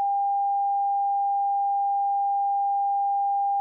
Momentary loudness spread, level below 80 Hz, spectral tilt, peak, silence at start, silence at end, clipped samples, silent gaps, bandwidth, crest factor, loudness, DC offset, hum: 0 LU; under -90 dBFS; 25.5 dB/octave; -20 dBFS; 0 s; 0 s; under 0.1%; none; 0.9 kHz; 4 dB; -24 LUFS; under 0.1%; none